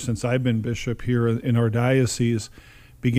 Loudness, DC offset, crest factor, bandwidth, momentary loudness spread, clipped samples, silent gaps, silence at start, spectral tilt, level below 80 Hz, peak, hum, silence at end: -23 LUFS; under 0.1%; 16 dB; 15 kHz; 7 LU; under 0.1%; none; 0 s; -6.5 dB/octave; -46 dBFS; -6 dBFS; none; 0 s